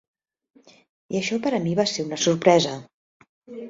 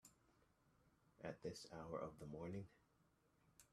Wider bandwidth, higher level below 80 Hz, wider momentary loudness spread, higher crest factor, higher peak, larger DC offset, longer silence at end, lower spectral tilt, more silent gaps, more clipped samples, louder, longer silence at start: second, 7.8 kHz vs 13.5 kHz; first, -64 dBFS vs -78 dBFS; first, 12 LU vs 5 LU; about the same, 22 dB vs 20 dB; first, -4 dBFS vs -36 dBFS; neither; about the same, 0 s vs 0.1 s; second, -4.5 dB/octave vs -6 dB/octave; first, 2.94-3.20 s, 3.29-3.41 s vs none; neither; first, -22 LUFS vs -53 LUFS; first, 1.1 s vs 0.05 s